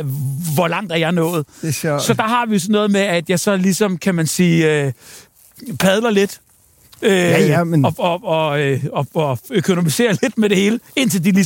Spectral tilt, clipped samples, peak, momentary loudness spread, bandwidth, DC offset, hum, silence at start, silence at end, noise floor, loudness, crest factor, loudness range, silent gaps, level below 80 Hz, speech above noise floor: -5 dB/octave; under 0.1%; -2 dBFS; 7 LU; 17 kHz; under 0.1%; none; 0 s; 0 s; -50 dBFS; -17 LUFS; 16 dB; 1 LU; none; -56 dBFS; 33 dB